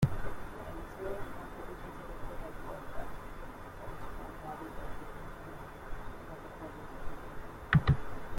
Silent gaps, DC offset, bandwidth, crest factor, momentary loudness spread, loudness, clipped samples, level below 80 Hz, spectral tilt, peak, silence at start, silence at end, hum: none; under 0.1%; 16.5 kHz; 26 dB; 15 LU; -40 LUFS; under 0.1%; -46 dBFS; -7.5 dB/octave; -12 dBFS; 0 s; 0 s; none